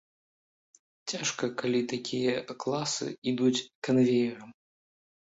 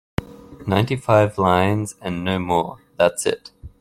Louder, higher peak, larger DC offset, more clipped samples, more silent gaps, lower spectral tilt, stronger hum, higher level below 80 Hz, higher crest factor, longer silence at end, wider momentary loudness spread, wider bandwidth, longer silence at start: second, -29 LUFS vs -20 LUFS; second, -14 dBFS vs -2 dBFS; neither; neither; first, 3.18-3.22 s, 3.75-3.82 s vs none; about the same, -4.5 dB/octave vs -5.5 dB/octave; neither; second, -72 dBFS vs -48 dBFS; about the same, 16 dB vs 18 dB; first, 0.85 s vs 0.1 s; second, 8 LU vs 14 LU; second, 8 kHz vs 15 kHz; first, 1.05 s vs 0.2 s